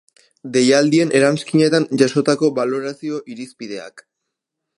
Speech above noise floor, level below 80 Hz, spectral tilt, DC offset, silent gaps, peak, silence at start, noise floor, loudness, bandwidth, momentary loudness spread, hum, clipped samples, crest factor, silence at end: 63 dB; -66 dBFS; -5 dB/octave; under 0.1%; none; 0 dBFS; 0.45 s; -80 dBFS; -16 LUFS; 11.5 kHz; 17 LU; none; under 0.1%; 18 dB; 0.8 s